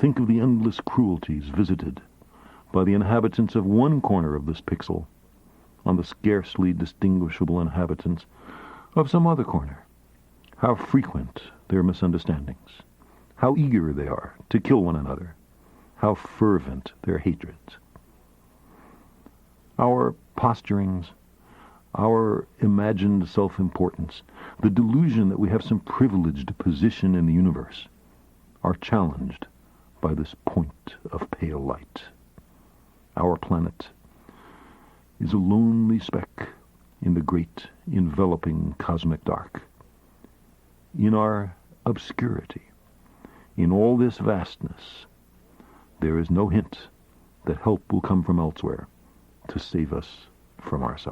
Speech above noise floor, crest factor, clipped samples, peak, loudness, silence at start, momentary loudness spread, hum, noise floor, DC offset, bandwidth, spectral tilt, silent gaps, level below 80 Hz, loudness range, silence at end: 33 dB; 20 dB; under 0.1%; -4 dBFS; -24 LUFS; 0 s; 17 LU; none; -56 dBFS; under 0.1%; 8 kHz; -9.5 dB/octave; none; -46 dBFS; 6 LU; 0 s